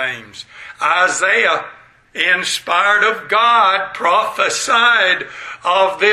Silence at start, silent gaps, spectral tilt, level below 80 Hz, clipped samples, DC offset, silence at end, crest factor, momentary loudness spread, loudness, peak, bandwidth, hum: 0 s; none; -0.5 dB/octave; -62 dBFS; under 0.1%; under 0.1%; 0 s; 16 dB; 17 LU; -14 LUFS; 0 dBFS; 16 kHz; none